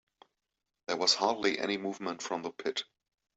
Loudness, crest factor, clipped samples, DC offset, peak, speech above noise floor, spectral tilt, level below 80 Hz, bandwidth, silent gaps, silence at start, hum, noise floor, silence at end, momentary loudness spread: -32 LUFS; 22 dB; under 0.1%; under 0.1%; -12 dBFS; 55 dB; -2 dB/octave; -78 dBFS; 8.2 kHz; none; 0.9 s; none; -87 dBFS; 0.55 s; 12 LU